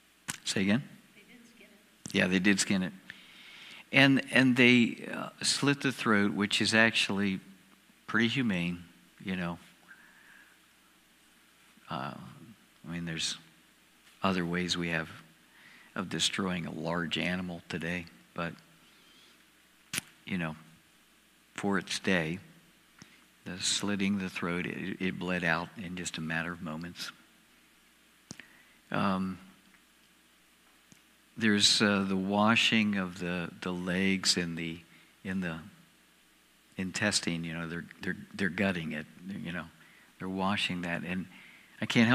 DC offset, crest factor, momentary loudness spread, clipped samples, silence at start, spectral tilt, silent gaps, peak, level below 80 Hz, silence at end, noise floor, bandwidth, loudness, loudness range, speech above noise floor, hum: under 0.1%; 28 dB; 20 LU; under 0.1%; 0.3 s; -4 dB/octave; none; -6 dBFS; -68 dBFS; 0 s; -64 dBFS; 15.5 kHz; -30 LUFS; 13 LU; 33 dB; none